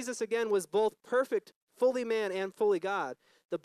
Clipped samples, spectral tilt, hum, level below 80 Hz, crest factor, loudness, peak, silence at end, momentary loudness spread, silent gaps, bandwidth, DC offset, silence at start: under 0.1%; -4 dB/octave; none; -90 dBFS; 14 dB; -32 LUFS; -18 dBFS; 0.05 s; 7 LU; 1.56-1.67 s, 3.45-3.49 s; 13.5 kHz; under 0.1%; 0 s